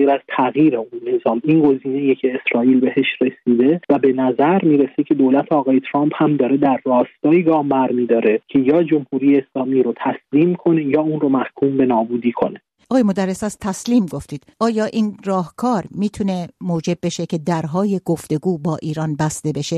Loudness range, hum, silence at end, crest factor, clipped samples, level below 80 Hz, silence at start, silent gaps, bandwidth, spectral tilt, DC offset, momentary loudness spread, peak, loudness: 5 LU; none; 0 s; 14 dB; under 0.1%; -56 dBFS; 0 s; none; 12.5 kHz; -7 dB/octave; under 0.1%; 8 LU; -2 dBFS; -18 LUFS